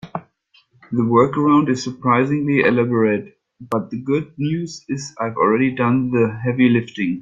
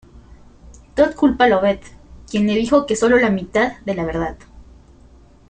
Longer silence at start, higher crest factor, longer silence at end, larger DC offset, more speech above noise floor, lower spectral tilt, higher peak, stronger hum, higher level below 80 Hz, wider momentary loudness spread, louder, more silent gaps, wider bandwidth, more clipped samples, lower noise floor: about the same, 0.05 s vs 0.15 s; about the same, 16 dB vs 18 dB; second, 0 s vs 0.85 s; neither; first, 40 dB vs 30 dB; first, -7 dB/octave vs -5.5 dB/octave; about the same, -2 dBFS vs -2 dBFS; neither; second, -58 dBFS vs -42 dBFS; about the same, 10 LU vs 11 LU; about the same, -18 LUFS vs -18 LUFS; neither; second, 7.8 kHz vs 9.4 kHz; neither; first, -58 dBFS vs -47 dBFS